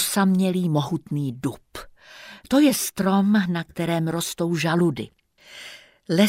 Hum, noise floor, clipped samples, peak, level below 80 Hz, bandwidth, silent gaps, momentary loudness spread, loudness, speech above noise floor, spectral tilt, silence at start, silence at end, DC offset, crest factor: none; -45 dBFS; under 0.1%; -4 dBFS; -58 dBFS; 16 kHz; none; 21 LU; -22 LUFS; 23 dB; -5 dB/octave; 0 s; 0 s; under 0.1%; 18 dB